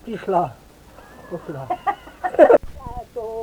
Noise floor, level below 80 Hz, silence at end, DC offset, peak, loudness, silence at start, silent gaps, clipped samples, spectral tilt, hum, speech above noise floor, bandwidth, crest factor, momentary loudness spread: -45 dBFS; -44 dBFS; 0 s; under 0.1%; -2 dBFS; -19 LUFS; 0.05 s; none; under 0.1%; -7 dB/octave; none; 21 dB; 17.5 kHz; 20 dB; 21 LU